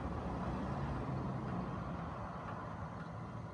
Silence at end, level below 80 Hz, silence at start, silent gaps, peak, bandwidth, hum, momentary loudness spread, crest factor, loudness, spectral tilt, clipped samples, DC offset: 0 s; -52 dBFS; 0 s; none; -28 dBFS; 10.5 kHz; none; 5 LU; 14 dB; -42 LUFS; -8.5 dB/octave; under 0.1%; under 0.1%